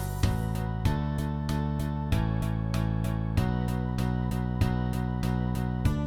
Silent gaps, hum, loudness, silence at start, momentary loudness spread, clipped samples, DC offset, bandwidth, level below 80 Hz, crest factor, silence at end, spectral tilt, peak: none; none; -29 LUFS; 0 s; 2 LU; under 0.1%; under 0.1%; 18 kHz; -34 dBFS; 16 dB; 0 s; -7 dB/octave; -12 dBFS